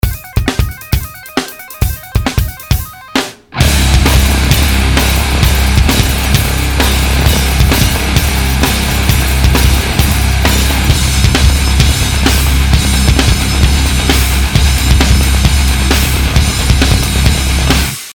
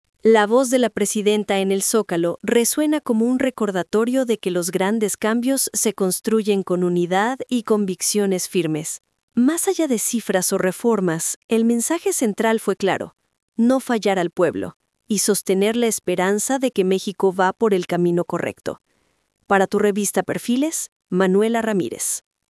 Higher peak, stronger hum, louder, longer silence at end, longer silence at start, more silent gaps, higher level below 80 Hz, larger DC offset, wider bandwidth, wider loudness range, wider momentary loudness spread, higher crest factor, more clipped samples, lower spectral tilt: about the same, 0 dBFS vs -2 dBFS; neither; first, -11 LUFS vs -20 LUFS; second, 0 s vs 0.4 s; second, 0.05 s vs 0.25 s; second, none vs 9.23-9.28 s, 11.36-11.49 s, 13.43-13.48 s, 14.76-14.80 s, 20.92-21.00 s; first, -12 dBFS vs -66 dBFS; neither; first, 19.5 kHz vs 12 kHz; about the same, 3 LU vs 2 LU; about the same, 7 LU vs 6 LU; second, 10 dB vs 16 dB; neither; about the same, -4 dB/octave vs -4 dB/octave